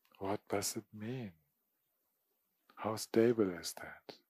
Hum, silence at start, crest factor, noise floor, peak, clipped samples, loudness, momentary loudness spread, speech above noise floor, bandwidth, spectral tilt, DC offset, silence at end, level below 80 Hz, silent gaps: none; 0.2 s; 22 dB; -83 dBFS; -16 dBFS; under 0.1%; -37 LUFS; 16 LU; 46 dB; 15.5 kHz; -4.5 dB/octave; under 0.1%; 0.15 s; -80 dBFS; none